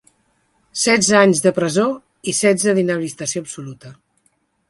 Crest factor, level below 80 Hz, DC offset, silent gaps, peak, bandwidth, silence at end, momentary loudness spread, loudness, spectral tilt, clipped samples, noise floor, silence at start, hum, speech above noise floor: 18 dB; -60 dBFS; under 0.1%; none; 0 dBFS; 11.5 kHz; 0.75 s; 17 LU; -17 LUFS; -3.5 dB/octave; under 0.1%; -64 dBFS; 0.75 s; none; 47 dB